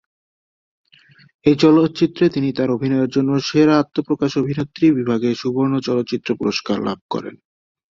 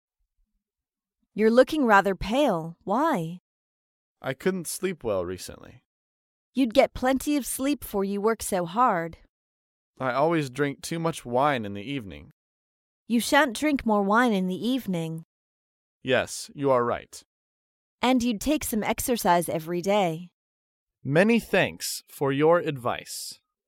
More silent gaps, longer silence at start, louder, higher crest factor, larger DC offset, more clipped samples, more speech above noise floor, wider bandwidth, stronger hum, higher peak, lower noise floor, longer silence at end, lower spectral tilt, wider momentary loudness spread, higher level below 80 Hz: second, 7.01-7.09 s vs 3.40-4.16 s, 5.85-6.53 s, 9.29-9.94 s, 12.32-13.06 s, 15.25-16.01 s, 17.25-17.98 s, 20.33-20.87 s; about the same, 1.45 s vs 1.35 s; first, -18 LUFS vs -25 LUFS; second, 16 dB vs 22 dB; neither; neither; second, 34 dB vs over 65 dB; second, 7.4 kHz vs 17 kHz; neither; about the same, -2 dBFS vs -4 dBFS; second, -51 dBFS vs under -90 dBFS; first, 0.55 s vs 0.35 s; first, -7 dB/octave vs -4.5 dB/octave; second, 8 LU vs 14 LU; about the same, -56 dBFS vs -52 dBFS